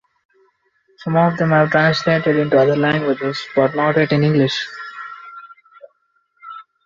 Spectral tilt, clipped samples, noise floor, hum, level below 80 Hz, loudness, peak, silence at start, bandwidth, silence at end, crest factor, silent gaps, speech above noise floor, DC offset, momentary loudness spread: -7 dB/octave; under 0.1%; -64 dBFS; none; -56 dBFS; -16 LUFS; -2 dBFS; 1 s; 7.4 kHz; 0.25 s; 16 dB; none; 48 dB; under 0.1%; 19 LU